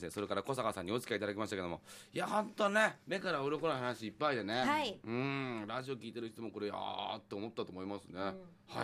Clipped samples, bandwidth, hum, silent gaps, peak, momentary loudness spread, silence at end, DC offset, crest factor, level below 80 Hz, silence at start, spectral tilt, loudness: under 0.1%; 15 kHz; none; none; -16 dBFS; 11 LU; 0 s; under 0.1%; 22 dB; -74 dBFS; 0 s; -5 dB/octave; -38 LUFS